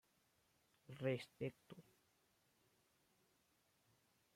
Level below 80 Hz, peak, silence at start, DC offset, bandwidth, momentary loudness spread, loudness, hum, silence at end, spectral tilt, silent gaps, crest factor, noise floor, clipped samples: -88 dBFS; -30 dBFS; 0.9 s; under 0.1%; 16 kHz; 19 LU; -47 LUFS; none; 2.55 s; -7 dB/octave; none; 24 dB; -81 dBFS; under 0.1%